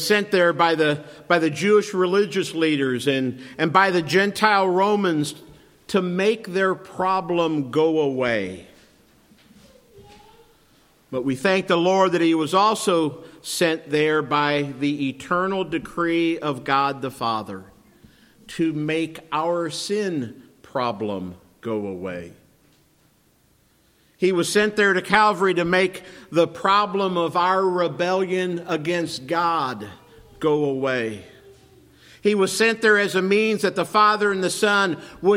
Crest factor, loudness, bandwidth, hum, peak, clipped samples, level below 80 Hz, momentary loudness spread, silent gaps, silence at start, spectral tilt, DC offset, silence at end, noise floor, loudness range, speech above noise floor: 22 dB; -21 LUFS; 16.5 kHz; none; 0 dBFS; under 0.1%; -62 dBFS; 11 LU; none; 0 s; -4.5 dB/octave; under 0.1%; 0 s; -60 dBFS; 8 LU; 39 dB